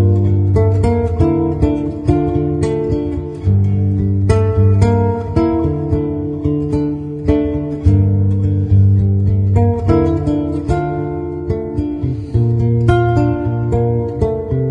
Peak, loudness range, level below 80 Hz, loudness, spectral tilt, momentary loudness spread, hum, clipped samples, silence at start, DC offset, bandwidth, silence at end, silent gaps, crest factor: 0 dBFS; 3 LU; -28 dBFS; -15 LUFS; -10 dB/octave; 7 LU; none; under 0.1%; 0 s; under 0.1%; 8.8 kHz; 0 s; none; 14 dB